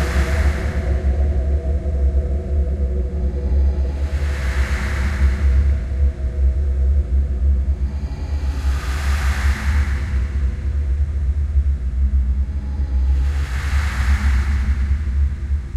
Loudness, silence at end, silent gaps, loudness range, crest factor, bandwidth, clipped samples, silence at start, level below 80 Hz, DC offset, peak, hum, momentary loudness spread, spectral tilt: -21 LUFS; 0 s; none; 2 LU; 12 dB; 9 kHz; under 0.1%; 0 s; -18 dBFS; under 0.1%; -6 dBFS; none; 4 LU; -6.5 dB/octave